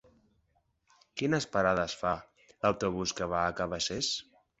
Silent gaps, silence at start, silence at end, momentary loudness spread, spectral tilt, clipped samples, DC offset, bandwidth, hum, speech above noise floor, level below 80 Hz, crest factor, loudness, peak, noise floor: none; 1.15 s; 0.4 s; 7 LU; -4 dB/octave; under 0.1%; under 0.1%; 8.4 kHz; none; 43 dB; -56 dBFS; 22 dB; -31 LUFS; -12 dBFS; -74 dBFS